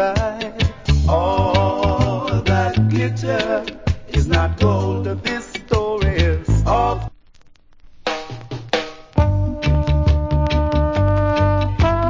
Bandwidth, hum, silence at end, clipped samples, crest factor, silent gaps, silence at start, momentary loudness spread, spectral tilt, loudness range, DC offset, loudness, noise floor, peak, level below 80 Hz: 7.6 kHz; none; 0 s; under 0.1%; 16 dB; none; 0 s; 7 LU; -7 dB/octave; 4 LU; under 0.1%; -19 LUFS; -46 dBFS; -2 dBFS; -24 dBFS